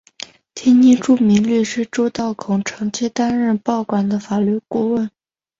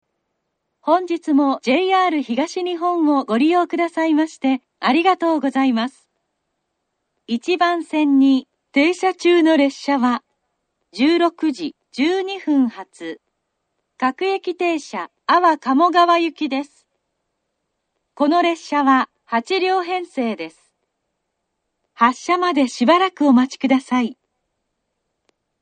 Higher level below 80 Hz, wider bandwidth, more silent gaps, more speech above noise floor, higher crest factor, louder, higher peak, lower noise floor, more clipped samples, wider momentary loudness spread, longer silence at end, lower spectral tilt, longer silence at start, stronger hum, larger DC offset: first, -56 dBFS vs -70 dBFS; second, 7.8 kHz vs 9.4 kHz; neither; second, 22 dB vs 58 dB; about the same, 14 dB vs 18 dB; about the same, -17 LUFS vs -18 LUFS; about the same, -2 dBFS vs 0 dBFS; second, -38 dBFS vs -75 dBFS; neither; about the same, 11 LU vs 10 LU; second, 0.5 s vs 1.5 s; first, -6 dB/octave vs -4 dB/octave; second, 0.55 s vs 0.85 s; neither; neither